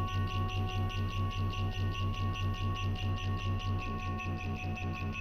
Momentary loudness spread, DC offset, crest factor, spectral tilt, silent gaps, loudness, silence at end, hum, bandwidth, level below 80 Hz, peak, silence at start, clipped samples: 3 LU; under 0.1%; 10 dB; -6 dB/octave; none; -35 LUFS; 0 s; none; 13 kHz; -42 dBFS; -24 dBFS; 0 s; under 0.1%